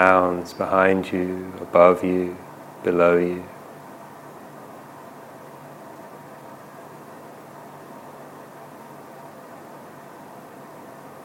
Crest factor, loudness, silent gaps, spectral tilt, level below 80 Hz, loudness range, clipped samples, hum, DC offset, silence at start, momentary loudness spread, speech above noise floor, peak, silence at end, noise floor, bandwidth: 24 dB; -20 LUFS; none; -7 dB/octave; -64 dBFS; 21 LU; under 0.1%; none; under 0.1%; 0 s; 24 LU; 23 dB; 0 dBFS; 0 s; -42 dBFS; 17 kHz